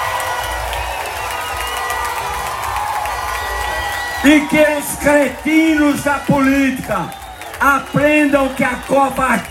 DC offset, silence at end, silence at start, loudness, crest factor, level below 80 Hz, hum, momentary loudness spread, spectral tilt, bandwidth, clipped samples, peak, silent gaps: under 0.1%; 0 s; 0 s; -16 LUFS; 16 dB; -36 dBFS; none; 9 LU; -4.5 dB/octave; 16.5 kHz; under 0.1%; 0 dBFS; none